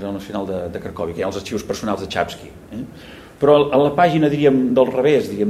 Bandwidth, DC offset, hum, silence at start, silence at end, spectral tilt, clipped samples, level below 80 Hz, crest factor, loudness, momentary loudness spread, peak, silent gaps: 14.5 kHz; under 0.1%; none; 0 s; 0 s; -6.5 dB/octave; under 0.1%; -50 dBFS; 16 dB; -18 LUFS; 18 LU; -2 dBFS; none